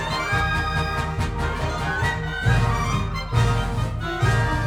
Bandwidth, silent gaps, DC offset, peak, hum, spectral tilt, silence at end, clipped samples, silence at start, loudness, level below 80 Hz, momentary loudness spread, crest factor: 15 kHz; none; under 0.1%; -6 dBFS; none; -5.5 dB/octave; 0 s; under 0.1%; 0 s; -23 LUFS; -30 dBFS; 5 LU; 16 dB